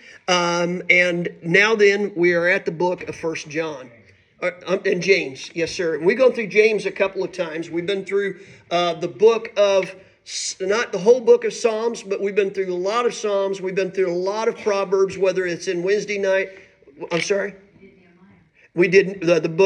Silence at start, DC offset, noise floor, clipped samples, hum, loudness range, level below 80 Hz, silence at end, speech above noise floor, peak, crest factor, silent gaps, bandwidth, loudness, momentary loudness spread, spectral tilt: 0.1 s; under 0.1%; -53 dBFS; under 0.1%; none; 4 LU; -66 dBFS; 0 s; 33 dB; -2 dBFS; 18 dB; none; 10 kHz; -20 LUFS; 11 LU; -4.5 dB/octave